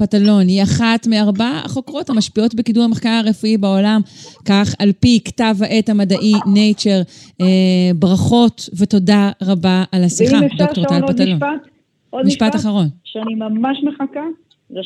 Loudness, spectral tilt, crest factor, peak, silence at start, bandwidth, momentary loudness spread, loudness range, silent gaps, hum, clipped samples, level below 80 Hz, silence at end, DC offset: -14 LUFS; -6 dB/octave; 12 dB; -2 dBFS; 0 s; 11 kHz; 10 LU; 4 LU; none; none; under 0.1%; -48 dBFS; 0 s; under 0.1%